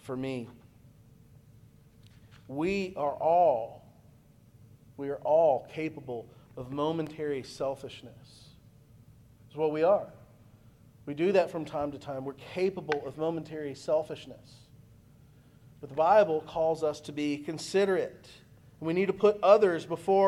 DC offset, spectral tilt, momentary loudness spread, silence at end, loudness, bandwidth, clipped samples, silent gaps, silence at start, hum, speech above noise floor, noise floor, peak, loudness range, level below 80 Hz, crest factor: under 0.1%; -6 dB/octave; 18 LU; 0 s; -29 LUFS; 13 kHz; under 0.1%; none; 0.05 s; none; 29 dB; -58 dBFS; -8 dBFS; 7 LU; -64 dBFS; 22 dB